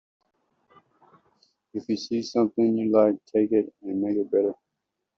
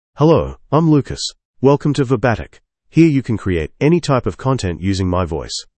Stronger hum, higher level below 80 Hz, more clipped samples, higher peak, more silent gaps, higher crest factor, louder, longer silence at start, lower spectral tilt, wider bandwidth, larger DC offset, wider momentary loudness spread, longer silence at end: neither; second, -72 dBFS vs -38 dBFS; neither; second, -8 dBFS vs 0 dBFS; second, none vs 1.45-1.53 s; about the same, 18 dB vs 16 dB; second, -25 LUFS vs -17 LUFS; first, 1.75 s vs 0.15 s; about the same, -6.5 dB/octave vs -6.5 dB/octave; second, 7.2 kHz vs 8.8 kHz; neither; about the same, 10 LU vs 9 LU; first, 0.65 s vs 0.15 s